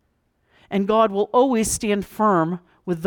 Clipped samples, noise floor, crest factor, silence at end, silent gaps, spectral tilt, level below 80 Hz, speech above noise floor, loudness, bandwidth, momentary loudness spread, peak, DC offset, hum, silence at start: under 0.1%; -67 dBFS; 16 dB; 0 s; none; -5 dB/octave; -50 dBFS; 48 dB; -20 LUFS; 19.5 kHz; 9 LU; -6 dBFS; under 0.1%; none; 0.7 s